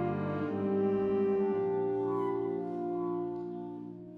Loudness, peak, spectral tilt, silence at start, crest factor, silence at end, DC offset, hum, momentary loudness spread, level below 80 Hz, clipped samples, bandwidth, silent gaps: -33 LUFS; -20 dBFS; -10.5 dB/octave; 0 s; 12 dB; 0 s; under 0.1%; none; 10 LU; -70 dBFS; under 0.1%; 4.2 kHz; none